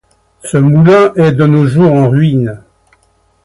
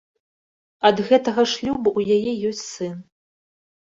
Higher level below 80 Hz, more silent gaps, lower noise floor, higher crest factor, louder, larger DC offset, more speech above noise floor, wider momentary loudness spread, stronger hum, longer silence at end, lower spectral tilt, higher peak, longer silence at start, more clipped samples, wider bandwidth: first, -44 dBFS vs -58 dBFS; neither; second, -53 dBFS vs under -90 dBFS; second, 10 dB vs 20 dB; first, -9 LUFS vs -21 LUFS; neither; second, 46 dB vs over 70 dB; second, 10 LU vs 13 LU; neither; about the same, 0.85 s vs 0.8 s; first, -8 dB/octave vs -4.5 dB/octave; about the same, 0 dBFS vs -2 dBFS; second, 0.45 s vs 0.8 s; neither; first, 11.5 kHz vs 7.8 kHz